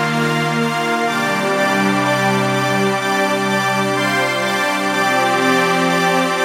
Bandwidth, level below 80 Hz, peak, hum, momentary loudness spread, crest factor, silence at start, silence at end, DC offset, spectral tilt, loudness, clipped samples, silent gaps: 16 kHz; -60 dBFS; -2 dBFS; none; 3 LU; 14 dB; 0 s; 0 s; under 0.1%; -4 dB/octave; -16 LUFS; under 0.1%; none